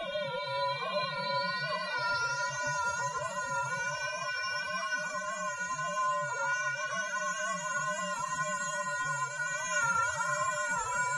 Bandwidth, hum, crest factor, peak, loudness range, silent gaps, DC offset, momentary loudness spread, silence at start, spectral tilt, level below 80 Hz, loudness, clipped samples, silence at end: 11.5 kHz; none; 14 dB; -18 dBFS; 2 LU; none; under 0.1%; 3 LU; 0 s; -1.5 dB/octave; -70 dBFS; -32 LUFS; under 0.1%; 0 s